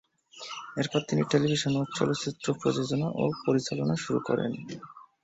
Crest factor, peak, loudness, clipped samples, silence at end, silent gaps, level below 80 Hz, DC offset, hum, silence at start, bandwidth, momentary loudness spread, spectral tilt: 20 dB; -10 dBFS; -29 LUFS; under 0.1%; 0.2 s; none; -64 dBFS; under 0.1%; none; 0.35 s; 8.2 kHz; 14 LU; -5.5 dB/octave